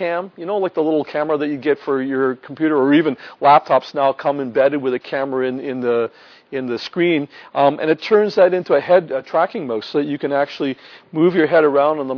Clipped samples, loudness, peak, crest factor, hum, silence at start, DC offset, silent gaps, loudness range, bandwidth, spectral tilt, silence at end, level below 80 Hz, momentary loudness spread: under 0.1%; -18 LUFS; 0 dBFS; 18 dB; none; 0 s; under 0.1%; none; 4 LU; 5.4 kHz; -7.5 dB/octave; 0 s; -68 dBFS; 10 LU